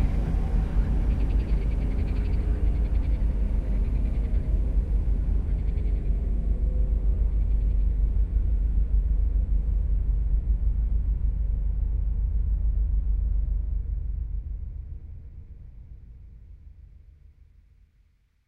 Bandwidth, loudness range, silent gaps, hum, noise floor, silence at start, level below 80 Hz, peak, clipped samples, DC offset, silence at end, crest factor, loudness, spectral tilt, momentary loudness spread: 3 kHz; 9 LU; none; none; -63 dBFS; 0 s; -24 dBFS; -12 dBFS; under 0.1%; under 0.1%; 1.65 s; 12 dB; -28 LUFS; -10 dB/octave; 10 LU